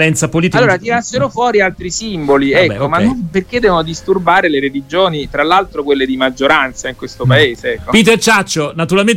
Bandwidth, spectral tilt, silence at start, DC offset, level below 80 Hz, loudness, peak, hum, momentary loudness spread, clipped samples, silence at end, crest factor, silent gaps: 16.5 kHz; -4.5 dB/octave; 0 s; under 0.1%; -38 dBFS; -12 LUFS; 0 dBFS; none; 7 LU; under 0.1%; 0 s; 12 dB; none